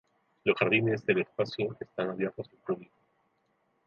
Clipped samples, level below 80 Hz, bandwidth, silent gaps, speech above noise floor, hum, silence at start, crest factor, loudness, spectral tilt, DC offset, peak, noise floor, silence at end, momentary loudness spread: under 0.1%; -72 dBFS; 7 kHz; none; 44 dB; none; 0.45 s; 22 dB; -30 LUFS; -7.5 dB/octave; under 0.1%; -10 dBFS; -74 dBFS; 1 s; 12 LU